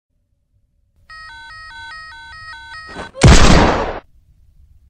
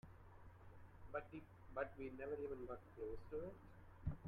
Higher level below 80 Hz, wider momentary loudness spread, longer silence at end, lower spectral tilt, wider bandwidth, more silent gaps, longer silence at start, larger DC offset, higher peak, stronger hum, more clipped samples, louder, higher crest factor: first, -20 dBFS vs -62 dBFS; first, 25 LU vs 16 LU; first, 0.9 s vs 0 s; second, -5 dB/octave vs -9 dB/octave; second, 10 kHz vs 14.5 kHz; neither; first, 1.8 s vs 0.05 s; neither; first, 0 dBFS vs -30 dBFS; neither; neither; first, -12 LUFS vs -51 LUFS; about the same, 16 dB vs 20 dB